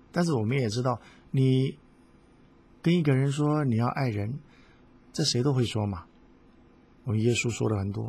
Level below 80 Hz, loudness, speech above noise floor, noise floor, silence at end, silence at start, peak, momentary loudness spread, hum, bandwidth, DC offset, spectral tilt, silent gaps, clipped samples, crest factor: -54 dBFS; -27 LUFS; 31 dB; -57 dBFS; 0 s; 0.15 s; -12 dBFS; 10 LU; none; 12.5 kHz; under 0.1%; -6 dB/octave; none; under 0.1%; 16 dB